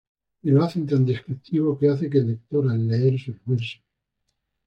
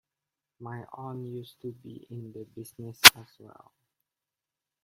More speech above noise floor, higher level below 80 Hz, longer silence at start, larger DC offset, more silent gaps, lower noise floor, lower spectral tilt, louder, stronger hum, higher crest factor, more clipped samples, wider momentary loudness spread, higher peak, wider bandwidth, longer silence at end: second, 55 dB vs 62 dB; about the same, -66 dBFS vs -62 dBFS; second, 0.45 s vs 0.6 s; neither; neither; second, -77 dBFS vs -90 dBFS; first, -9.5 dB/octave vs -0.5 dB/octave; second, -23 LUFS vs -16 LUFS; neither; second, 16 dB vs 30 dB; neither; second, 8 LU vs 28 LU; second, -6 dBFS vs 0 dBFS; second, 6.4 kHz vs 16.5 kHz; second, 0.95 s vs 1.6 s